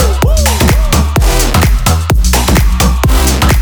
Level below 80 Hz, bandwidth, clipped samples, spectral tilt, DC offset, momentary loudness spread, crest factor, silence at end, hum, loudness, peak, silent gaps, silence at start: -10 dBFS; over 20 kHz; under 0.1%; -4.5 dB/octave; under 0.1%; 2 LU; 8 dB; 0 s; none; -10 LUFS; 0 dBFS; none; 0 s